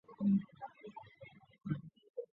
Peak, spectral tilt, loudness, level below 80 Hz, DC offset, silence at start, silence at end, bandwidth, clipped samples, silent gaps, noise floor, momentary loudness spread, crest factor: -24 dBFS; -9.5 dB/octave; -39 LUFS; -76 dBFS; under 0.1%; 0.1 s; 0.1 s; 4.1 kHz; under 0.1%; 2.10-2.14 s; -60 dBFS; 23 LU; 18 dB